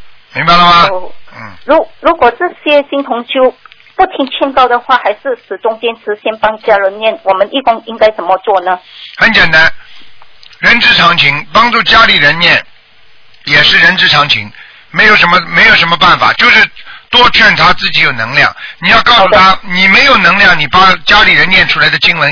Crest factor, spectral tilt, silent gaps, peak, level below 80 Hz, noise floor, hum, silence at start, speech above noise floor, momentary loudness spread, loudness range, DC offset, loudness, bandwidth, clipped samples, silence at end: 8 dB; -4 dB/octave; none; 0 dBFS; -34 dBFS; -44 dBFS; none; 0 s; 36 dB; 11 LU; 7 LU; under 0.1%; -6 LUFS; 5.4 kHz; 3%; 0 s